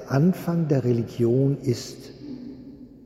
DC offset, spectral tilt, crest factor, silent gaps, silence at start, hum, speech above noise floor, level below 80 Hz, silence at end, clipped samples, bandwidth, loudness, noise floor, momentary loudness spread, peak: under 0.1%; -8 dB/octave; 18 dB; none; 0 s; none; 21 dB; -56 dBFS; 0.05 s; under 0.1%; 14.5 kHz; -23 LUFS; -43 dBFS; 19 LU; -8 dBFS